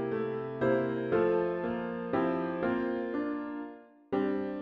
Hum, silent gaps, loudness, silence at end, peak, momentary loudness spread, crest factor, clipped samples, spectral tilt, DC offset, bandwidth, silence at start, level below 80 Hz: none; none; -32 LUFS; 0 s; -16 dBFS; 7 LU; 14 dB; under 0.1%; -9.5 dB/octave; under 0.1%; 5.4 kHz; 0 s; -64 dBFS